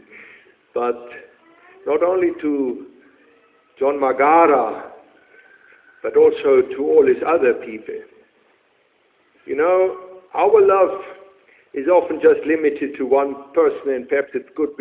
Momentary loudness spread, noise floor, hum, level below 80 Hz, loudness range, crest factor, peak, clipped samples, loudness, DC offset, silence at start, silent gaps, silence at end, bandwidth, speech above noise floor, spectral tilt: 18 LU; -60 dBFS; none; -62 dBFS; 6 LU; 18 dB; -2 dBFS; under 0.1%; -18 LUFS; under 0.1%; 0.2 s; none; 0.1 s; 4 kHz; 43 dB; -9 dB/octave